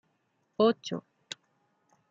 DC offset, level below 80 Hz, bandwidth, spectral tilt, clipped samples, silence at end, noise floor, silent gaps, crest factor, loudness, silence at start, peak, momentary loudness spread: under 0.1%; -84 dBFS; 7.8 kHz; -5 dB/octave; under 0.1%; 1.1 s; -75 dBFS; none; 22 dB; -29 LUFS; 0.6 s; -12 dBFS; 18 LU